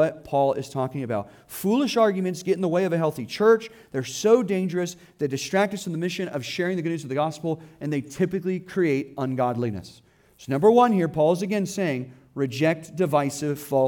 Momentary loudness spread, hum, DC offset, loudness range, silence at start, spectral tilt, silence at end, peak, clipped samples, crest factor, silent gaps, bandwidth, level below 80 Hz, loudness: 10 LU; none; under 0.1%; 4 LU; 0 s; -6 dB/octave; 0 s; -6 dBFS; under 0.1%; 18 dB; none; 19 kHz; -64 dBFS; -24 LUFS